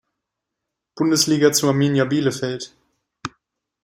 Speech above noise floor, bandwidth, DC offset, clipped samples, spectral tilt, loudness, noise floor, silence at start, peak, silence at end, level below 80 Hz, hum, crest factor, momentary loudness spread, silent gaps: 63 dB; 16.5 kHz; under 0.1%; under 0.1%; -4.5 dB/octave; -18 LUFS; -82 dBFS; 0.95 s; -4 dBFS; 0.55 s; -62 dBFS; none; 18 dB; 19 LU; none